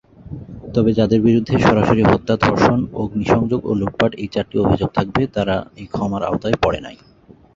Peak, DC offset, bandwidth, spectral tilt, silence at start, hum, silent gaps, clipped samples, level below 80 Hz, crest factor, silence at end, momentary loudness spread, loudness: -2 dBFS; under 0.1%; 7.6 kHz; -7.5 dB/octave; 0.25 s; none; none; under 0.1%; -38 dBFS; 16 dB; 0.6 s; 11 LU; -18 LUFS